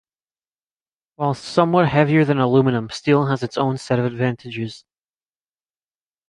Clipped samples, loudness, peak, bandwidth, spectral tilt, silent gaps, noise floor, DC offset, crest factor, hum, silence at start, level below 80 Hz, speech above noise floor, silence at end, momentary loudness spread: under 0.1%; -19 LUFS; -2 dBFS; 11 kHz; -7 dB/octave; none; under -90 dBFS; under 0.1%; 18 dB; none; 1.2 s; -56 dBFS; over 72 dB; 1.55 s; 10 LU